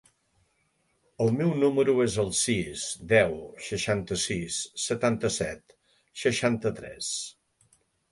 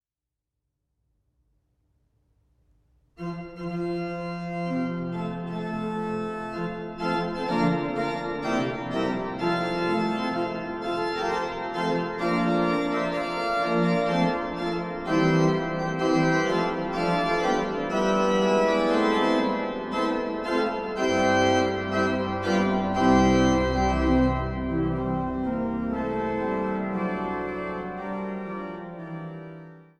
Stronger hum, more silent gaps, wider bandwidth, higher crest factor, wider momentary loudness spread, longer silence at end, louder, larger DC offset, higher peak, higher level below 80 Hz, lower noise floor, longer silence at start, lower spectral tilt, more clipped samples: neither; neither; about the same, 11.5 kHz vs 11.5 kHz; about the same, 22 dB vs 18 dB; about the same, 11 LU vs 10 LU; first, 0.8 s vs 0.15 s; about the same, -27 LUFS vs -26 LUFS; neither; about the same, -6 dBFS vs -8 dBFS; second, -56 dBFS vs -44 dBFS; second, -72 dBFS vs -88 dBFS; second, 1.2 s vs 3.2 s; second, -4 dB/octave vs -6 dB/octave; neither